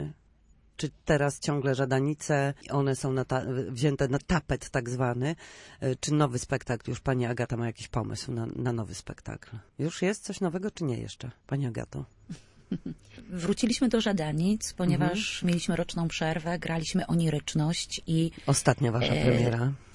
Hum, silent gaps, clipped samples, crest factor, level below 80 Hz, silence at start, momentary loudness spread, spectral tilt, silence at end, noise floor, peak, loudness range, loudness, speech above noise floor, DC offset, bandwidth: none; none; under 0.1%; 22 dB; -50 dBFS; 0 s; 14 LU; -5.5 dB/octave; 0 s; -61 dBFS; -8 dBFS; 6 LU; -29 LUFS; 32 dB; under 0.1%; 11.5 kHz